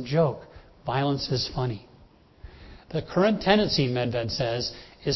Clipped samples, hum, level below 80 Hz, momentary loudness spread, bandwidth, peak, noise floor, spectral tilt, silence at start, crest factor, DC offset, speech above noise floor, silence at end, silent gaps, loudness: under 0.1%; none; -50 dBFS; 13 LU; 6.2 kHz; -6 dBFS; -55 dBFS; -6 dB/octave; 0 s; 22 dB; under 0.1%; 29 dB; 0 s; none; -26 LUFS